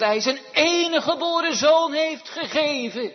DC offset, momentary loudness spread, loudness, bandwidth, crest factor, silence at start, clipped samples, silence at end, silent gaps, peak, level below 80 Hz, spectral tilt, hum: under 0.1%; 8 LU; -21 LUFS; 6.4 kHz; 16 dB; 0 s; under 0.1%; 0 s; none; -6 dBFS; -70 dBFS; -2 dB/octave; none